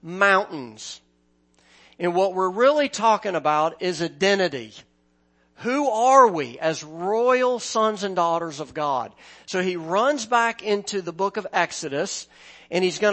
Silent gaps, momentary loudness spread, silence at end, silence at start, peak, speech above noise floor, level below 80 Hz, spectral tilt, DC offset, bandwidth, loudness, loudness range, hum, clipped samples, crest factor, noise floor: none; 13 LU; 0 s; 0 s; -2 dBFS; 42 dB; -70 dBFS; -3.5 dB/octave; under 0.1%; 8.8 kHz; -22 LUFS; 3 LU; none; under 0.1%; 20 dB; -64 dBFS